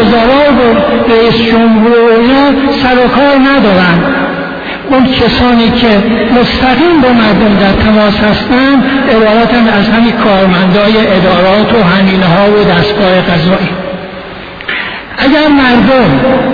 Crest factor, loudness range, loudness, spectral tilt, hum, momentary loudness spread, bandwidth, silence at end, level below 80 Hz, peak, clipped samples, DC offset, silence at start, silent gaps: 6 dB; 3 LU; -7 LUFS; -8 dB/octave; none; 8 LU; 5.4 kHz; 0 s; -28 dBFS; 0 dBFS; 0.5%; under 0.1%; 0 s; none